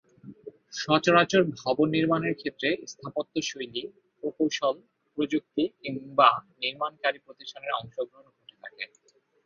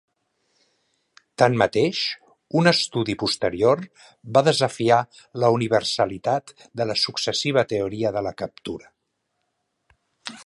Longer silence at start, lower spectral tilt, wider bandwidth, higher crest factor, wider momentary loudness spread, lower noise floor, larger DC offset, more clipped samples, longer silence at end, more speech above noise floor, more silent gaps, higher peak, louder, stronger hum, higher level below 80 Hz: second, 0.25 s vs 1.4 s; about the same, -4.5 dB/octave vs -4.5 dB/octave; second, 7.4 kHz vs 11.5 kHz; about the same, 24 dB vs 22 dB; first, 19 LU vs 16 LU; second, -66 dBFS vs -76 dBFS; neither; neither; first, 0.6 s vs 0.05 s; second, 39 dB vs 54 dB; neither; about the same, -4 dBFS vs -2 dBFS; second, -27 LUFS vs -22 LUFS; neither; second, -70 dBFS vs -58 dBFS